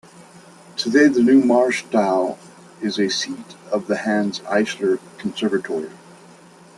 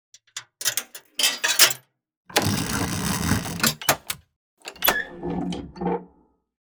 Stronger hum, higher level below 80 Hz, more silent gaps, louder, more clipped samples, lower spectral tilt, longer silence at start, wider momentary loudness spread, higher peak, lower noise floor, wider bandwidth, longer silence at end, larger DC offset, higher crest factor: neither; second, -66 dBFS vs -46 dBFS; second, none vs 2.17-2.25 s, 4.36-4.57 s; first, -20 LUFS vs -23 LUFS; neither; first, -4.5 dB/octave vs -2 dB/octave; second, 0.2 s vs 0.35 s; about the same, 14 LU vs 16 LU; about the same, -4 dBFS vs -2 dBFS; second, -46 dBFS vs -60 dBFS; second, 12 kHz vs over 20 kHz; first, 0.8 s vs 0.55 s; neither; second, 18 dB vs 24 dB